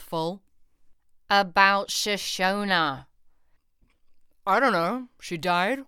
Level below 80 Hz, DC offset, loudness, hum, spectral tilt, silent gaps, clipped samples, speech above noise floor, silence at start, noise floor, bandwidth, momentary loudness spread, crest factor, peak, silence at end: -62 dBFS; under 0.1%; -24 LUFS; none; -3 dB/octave; none; under 0.1%; 39 dB; 0 s; -63 dBFS; 18 kHz; 15 LU; 24 dB; -4 dBFS; 0.05 s